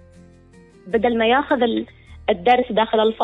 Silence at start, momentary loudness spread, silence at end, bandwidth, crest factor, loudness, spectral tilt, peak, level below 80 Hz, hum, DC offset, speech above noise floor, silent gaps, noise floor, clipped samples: 0.85 s; 9 LU; 0 s; 6 kHz; 14 dB; -19 LUFS; -6.5 dB/octave; -6 dBFS; -50 dBFS; none; under 0.1%; 30 dB; none; -48 dBFS; under 0.1%